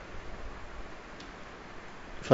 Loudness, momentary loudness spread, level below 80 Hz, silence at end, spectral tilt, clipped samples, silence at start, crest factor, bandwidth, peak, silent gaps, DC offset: -46 LUFS; 2 LU; -48 dBFS; 0 s; -5 dB/octave; under 0.1%; 0 s; 28 dB; 7.6 kHz; -6 dBFS; none; under 0.1%